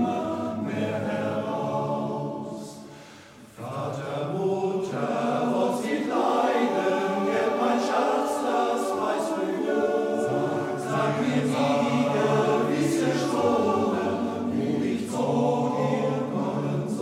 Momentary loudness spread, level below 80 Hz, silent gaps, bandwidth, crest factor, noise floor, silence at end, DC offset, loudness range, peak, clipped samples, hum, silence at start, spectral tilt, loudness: 7 LU; -68 dBFS; none; 15.5 kHz; 16 dB; -47 dBFS; 0 s; under 0.1%; 7 LU; -10 dBFS; under 0.1%; none; 0 s; -6 dB/octave; -26 LUFS